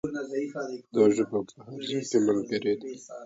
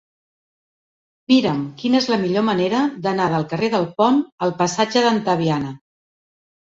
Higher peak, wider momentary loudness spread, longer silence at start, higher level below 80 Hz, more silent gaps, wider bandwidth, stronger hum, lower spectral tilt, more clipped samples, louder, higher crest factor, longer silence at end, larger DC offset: second, -10 dBFS vs -2 dBFS; first, 13 LU vs 5 LU; second, 0.05 s vs 1.3 s; second, -68 dBFS vs -60 dBFS; second, none vs 4.32-4.38 s; about the same, 8 kHz vs 7.8 kHz; neither; about the same, -5.5 dB/octave vs -5.5 dB/octave; neither; second, -28 LUFS vs -19 LUFS; about the same, 18 dB vs 18 dB; second, 0 s vs 1 s; neither